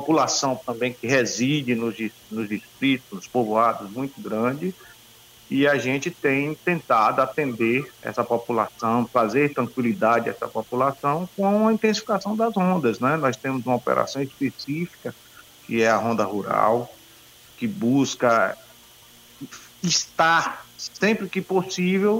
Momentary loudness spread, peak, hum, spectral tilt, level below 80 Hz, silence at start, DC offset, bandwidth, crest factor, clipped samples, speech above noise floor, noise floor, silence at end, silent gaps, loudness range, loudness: 11 LU; -6 dBFS; none; -4.5 dB/octave; -64 dBFS; 0 s; under 0.1%; 16 kHz; 18 dB; under 0.1%; 27 dB; -50 dBFS; 0 s; none; 3 LU; -23 LUFS